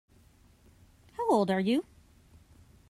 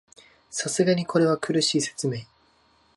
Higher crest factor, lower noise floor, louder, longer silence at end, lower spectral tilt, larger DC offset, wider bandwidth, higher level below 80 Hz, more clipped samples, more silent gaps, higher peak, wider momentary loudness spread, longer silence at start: about the same, 18 dB vs 18 dB; about the same, -61 dBFS vs -62 dBFS; second, -29 LUFS vs -24 LUFS; first, 1.05 s vs 0.7 s; first, -6.5 dB/octave vs -4 dB/octave; neither; first, 13.5 kHz vs 11.5 kHz; about the same, -64 dBFS vs -68 dBFS; neither; neither; second, -14 dBFS vs -8 dBFS; first, 21 LU vs 9 LU; first, 1.2 s vs 0.5 s